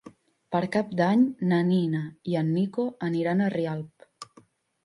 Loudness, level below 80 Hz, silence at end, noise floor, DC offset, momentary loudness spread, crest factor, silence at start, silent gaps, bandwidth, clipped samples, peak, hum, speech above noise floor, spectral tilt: -26 LUFS; -70 dBFS; 0.6 s; -59 dBFS; under 0.1%; 21 LU; 16 dB; 0.05 s; none; 11.5 kHz; under 0.1%; -10 dBFS; none; 34 dB; -8 dB/octave